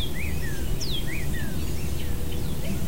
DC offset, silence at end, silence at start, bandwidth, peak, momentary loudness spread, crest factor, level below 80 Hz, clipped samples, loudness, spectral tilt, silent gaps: 5%; 0 s; 0 s; 16 kHz; -14 dBFS; 2 LU; 12 dB; -32 dBFS; under 0.1%; -31 LUFS; -4.5 dB/octave; none